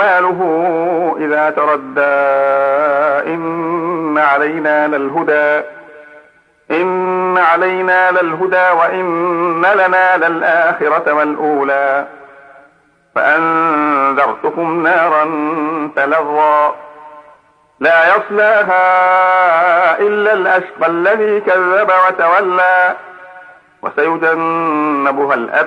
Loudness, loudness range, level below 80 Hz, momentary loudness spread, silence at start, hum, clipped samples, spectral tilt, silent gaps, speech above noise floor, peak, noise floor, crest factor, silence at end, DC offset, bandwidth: -12 LUFS; 4 LU; -66 dBFS; 7 LU; 0 s; none; under 0.1%; -6.5 dB/octave; none; 39 dB; 0 dBFS; -51 dBFS; 12 dB; 0 s; under 0.1%; 9.8 kHz